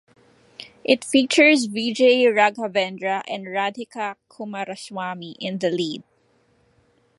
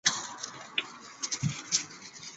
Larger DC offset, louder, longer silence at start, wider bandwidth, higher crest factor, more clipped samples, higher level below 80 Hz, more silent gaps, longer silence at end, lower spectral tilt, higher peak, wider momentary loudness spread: neither; first, -21 LUFS vs -33 LUFS; first, 0.6 s vs 0.05 s; first, 11.5 kHz vs 8.4 kHz; second, 20 dB vs 26 dB; neither; second, -74 dBFS vs -68 dBFS; neither; first, 1.2 s vs 0 s; first, -3.5 dB/octave vs -1.5 dB/octave; first, -2 dBFS vs -8 dBFS; first, 16 LU vs 13 LU